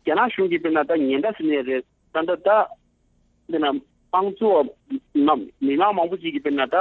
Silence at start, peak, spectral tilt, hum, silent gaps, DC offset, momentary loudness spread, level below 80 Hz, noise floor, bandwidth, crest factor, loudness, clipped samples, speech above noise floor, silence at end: 0.05 s; -6 dBFS; -8 dB/octave; none; none; under 0.1%; 8 LU; -64 dBFS; -63 dBFS; 4.2 kHz; 16 dB; -22 LUFS; under 0.1%; 42 dB; 0 s